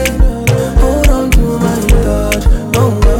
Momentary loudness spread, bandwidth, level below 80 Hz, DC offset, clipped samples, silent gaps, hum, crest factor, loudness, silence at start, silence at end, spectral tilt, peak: 3 LU; 17 kHz; -12 dBFS; under 0.1%; under 0.1%; none; none; 10 dB; -12 LUFS; 0 s; 0 s; -6 dB/octave; 0 dBFS